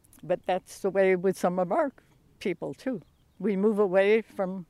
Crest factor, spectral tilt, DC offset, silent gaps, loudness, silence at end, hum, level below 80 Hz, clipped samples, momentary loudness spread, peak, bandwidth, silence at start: 16 dB; -6.5 dB/octave; under 0.1%; none; -27 LUFS; 0.05 s; none; -66 dBFS; under 0.1%; 11 LU; -12 dBFS; 13.5 kHz; 0.25 s